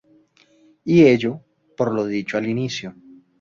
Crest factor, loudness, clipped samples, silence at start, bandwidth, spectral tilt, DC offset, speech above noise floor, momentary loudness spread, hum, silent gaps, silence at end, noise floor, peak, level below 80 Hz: 18 dB; -19 LUFS; under 0.1%; 0.85 s; 7.4 kHz; -6.5 dB/octave; under 0.1%; 38 dB; 19 LU; none; none; 0.5 s; -56 dBFS; -2 dBFS; -58 dBFS